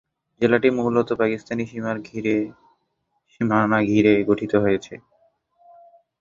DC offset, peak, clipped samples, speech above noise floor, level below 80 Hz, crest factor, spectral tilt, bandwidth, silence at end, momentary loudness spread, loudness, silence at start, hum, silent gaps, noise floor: under 0.1%; -2 dBFS; under 0.1%; 52 dB; -56 dBFS; 20 dB; -7.5 dB/octave; 7.4 kHz; 1.25 s; 11 LU; -21 LUFS; 0.4 s; none; none; -73 dBFS